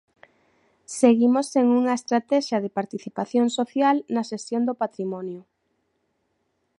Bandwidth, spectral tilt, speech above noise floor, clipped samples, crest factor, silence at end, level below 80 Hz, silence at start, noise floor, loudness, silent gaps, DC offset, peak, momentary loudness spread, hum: 11.5 kHz; -5 dB/octave; 50 dB; under 0.1%; 20 dB; 1.4 s; -76 dBFS; 0.9 s; -73 dBFS; -23 LUFS; none; under 0.1%; -4 dBFS; 12 LU; none